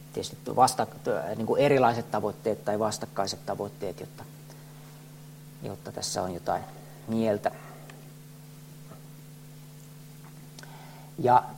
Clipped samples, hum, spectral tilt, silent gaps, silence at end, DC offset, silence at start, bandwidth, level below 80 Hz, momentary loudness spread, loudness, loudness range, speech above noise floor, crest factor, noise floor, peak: under 0.1%; none; -5 dB/octave; none; 0 s; under 0.1%; 0 s; 16.5 kHz; -64 dBFS; 24 LU; -28 LUFS; 13 LU; 20 dB; 24 dB; -47 dBFS; -6 dBFS